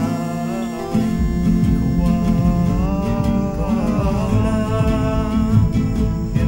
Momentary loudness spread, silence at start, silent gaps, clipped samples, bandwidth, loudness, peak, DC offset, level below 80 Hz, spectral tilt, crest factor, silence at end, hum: 5 LU; 0 s; none; under 0.1%; 16.5 kHz; -19 LUFS; -2 dBFS; under 0.1%; -24 dBFS; -8 dB/octave; 14 dB; 0 s; none